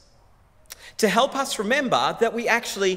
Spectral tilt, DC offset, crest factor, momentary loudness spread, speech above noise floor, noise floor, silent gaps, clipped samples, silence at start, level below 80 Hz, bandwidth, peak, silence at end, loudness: -3 dB/octave; under 0.1%; 20 dB; 5 LU; 33 dB; -55 dBFS; none; under 0.1%; 0.7 s; -58 dBFS; 16 kHz; -4 dBFS; 0 s; -22 LUFS